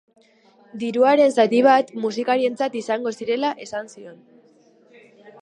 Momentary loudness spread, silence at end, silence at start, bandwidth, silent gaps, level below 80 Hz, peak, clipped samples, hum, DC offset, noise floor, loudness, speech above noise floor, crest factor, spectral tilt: 16 LU; 1.25 s; 0.75 s; 10.5 kHz; none; -76 dBFS; -2 dBFS; under 0.1%; none; under 0.1%; -55 dBFS; -20 LUFS; 35 dB; 18 dB; -4.5 dB/octave